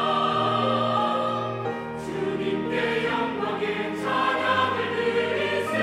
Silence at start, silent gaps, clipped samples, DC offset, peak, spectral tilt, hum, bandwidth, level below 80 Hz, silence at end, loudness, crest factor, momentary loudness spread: 0 s; none; under 0.1%; under 0.1%; -10 dBFS; -5.5 dB/octave; none; 15 kHz; -62 dBFS; 0 s; -25 LUFS; 16 dB; 6 LU